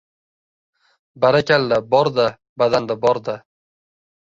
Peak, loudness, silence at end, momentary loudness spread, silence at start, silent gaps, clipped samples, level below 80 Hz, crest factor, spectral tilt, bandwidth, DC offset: -2 dBFS; -18 LUFS; 0.85 s; 7 LU; 1.15 s; 2.49-2.56 s; under 0.1%; -58 dBFS; 18 dB; -6 dB/octave; 7.8 kHz; under 0.1%